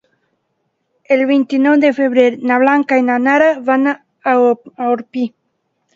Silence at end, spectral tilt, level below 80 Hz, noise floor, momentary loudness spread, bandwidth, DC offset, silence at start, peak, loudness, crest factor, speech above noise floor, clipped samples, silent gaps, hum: 0.65 s; -5.5 dB/octave; -66 dBFS; -68 dBFS; 7 LU; 7.4 kHz; under 0.1%; 1.1 s; 0 dBFS; -14 LUFS; 14 dB; 55 dB; under 0.1%; none; none